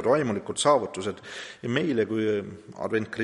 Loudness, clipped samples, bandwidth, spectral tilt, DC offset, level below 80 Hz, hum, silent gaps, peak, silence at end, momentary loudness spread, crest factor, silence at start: -27 LUFS; under 0.1%; 11.5 kHz; -4.5 dB/octave; under 0.1%; -66 dBFS; none; none; -8 dBFS; 0 s; 13 LU; 18 dB; 0 s